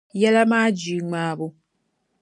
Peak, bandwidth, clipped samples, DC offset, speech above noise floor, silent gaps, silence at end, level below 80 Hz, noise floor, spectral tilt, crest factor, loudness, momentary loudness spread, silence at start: -4 dBFS; 11 kHz; under 0.1%; under 0.1%; 52 dB; none; 0.7 s; -72 dBFS; -72 dBFS; -5.5 dB/octave; 18 dB; -20 LUFS; 13 LU; 0.15 s